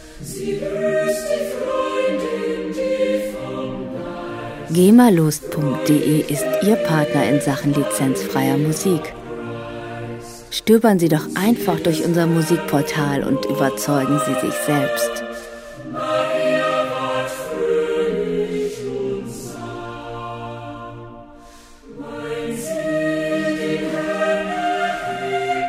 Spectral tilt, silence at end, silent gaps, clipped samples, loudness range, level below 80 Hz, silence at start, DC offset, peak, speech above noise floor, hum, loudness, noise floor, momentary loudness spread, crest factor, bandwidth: -5.5 dB/octave; 0 s; none; under 0.1%; 9 LU; -50 dBFS; 0 s; under 0.1%; 0 dBFS; 25 dB; none; -20 LUFS; -43 dBFS; 14 LU; 20 dB; 16 kHz